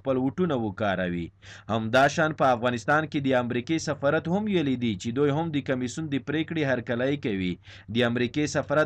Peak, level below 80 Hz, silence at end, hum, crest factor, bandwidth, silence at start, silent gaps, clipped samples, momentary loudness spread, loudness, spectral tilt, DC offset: -12 dBFS; -58 dBFS; 0 s; none; 14 dB; 11 kHz; 0.05 s; none; under 0.1%; 8 LU; -26 LUFS; -6 dB/octave; under 0.1%